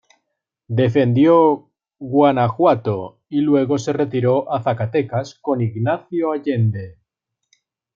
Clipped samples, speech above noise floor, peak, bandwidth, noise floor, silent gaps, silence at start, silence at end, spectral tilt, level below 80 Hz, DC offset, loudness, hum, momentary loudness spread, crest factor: under 0.1%; 60 dB; -2 dBFS; 7.4 kHz; -77 dBFS; none; 0.7 s; 1.05 s; -8 dB/octave; -62 dBFS; under 0.1%; -18 LUFS; none; 10 LU; 16 dB